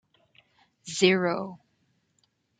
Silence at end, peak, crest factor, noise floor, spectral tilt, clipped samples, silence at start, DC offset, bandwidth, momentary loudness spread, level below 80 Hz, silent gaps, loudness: 1.05 s; -6 dBFS; 24 dB; -72 dBFS; -4.5 dB/octave; under 0.1%; 0.85 s; under 0.1%; 9.4 kHz; 19 LU; -74 dBFS; none; -25 LUFS